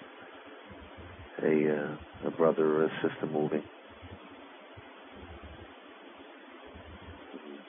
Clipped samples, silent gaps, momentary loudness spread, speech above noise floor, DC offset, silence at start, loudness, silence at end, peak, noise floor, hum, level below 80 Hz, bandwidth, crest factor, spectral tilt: under 0.1%; none; 22 LU; 21 dB; under 0.1%; 0 s; -30 LUFS; 0 s; -14 dBFS; -51 dBFS; none; -60 dBFS; 3.8 kHz; 20 dB; -10 dB/octave